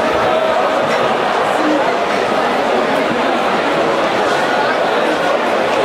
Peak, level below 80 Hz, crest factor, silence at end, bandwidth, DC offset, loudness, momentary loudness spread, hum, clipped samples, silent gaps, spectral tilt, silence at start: -2 dBFS; -50 dBFS; 12 dB; 0 s; 16 kHz; under 0.1%; -14 LUFS; 1 LU; none; under 0.1%; none; -4 dB/octave; 0 s